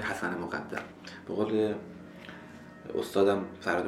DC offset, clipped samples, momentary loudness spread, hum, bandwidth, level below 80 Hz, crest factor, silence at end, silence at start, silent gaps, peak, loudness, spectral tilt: under 0.1%; under 0.1%; 19 LU; none; 14.5 kHz; -66 dBFS; 20 dB; 0 s; 0 s; none; -14 dBFS; -31 LUFS; -5.5 dB/octave